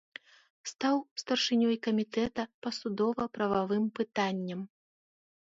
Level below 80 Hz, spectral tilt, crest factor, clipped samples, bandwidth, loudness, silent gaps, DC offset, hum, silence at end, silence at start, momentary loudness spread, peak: -68 dBFS; -4.5 dB/octave; 18 dB; under 0.1%; 7.8 kHz; -31 LUFS; 1.11-1.16 s, 2.54-2.62 s; under 0.1%; none; 0.9 s; 0.65 s; 15 LU; -16 dBFS